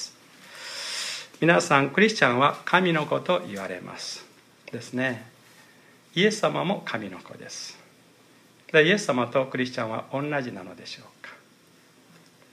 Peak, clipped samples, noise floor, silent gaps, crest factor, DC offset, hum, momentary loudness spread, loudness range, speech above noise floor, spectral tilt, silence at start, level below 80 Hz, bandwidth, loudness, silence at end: -4 dBFS; under 0.1%; -57 dBFS; none; 24 dB; under 0.1%; none; 20 LU; 8 LU; 32 dB; -4.5 dB/octave; 0 s; -76 dBFS; 15.5 kHz; -24 LUFS; 1.15 s